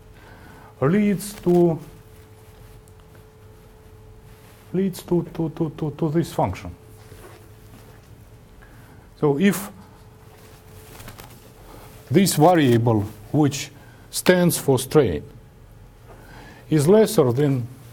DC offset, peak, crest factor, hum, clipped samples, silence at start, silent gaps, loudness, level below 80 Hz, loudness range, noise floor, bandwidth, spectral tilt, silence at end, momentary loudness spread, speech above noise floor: under 0.1%; -2 dBFS; 20 dB; none; under 0.1%; 0.3 s; none; -20 LUFS; -50 dBFS; 10 LU; -47 dBFS; 19 kHz; -6 dB/octave; 0.2 s; 24 LU; 28 dB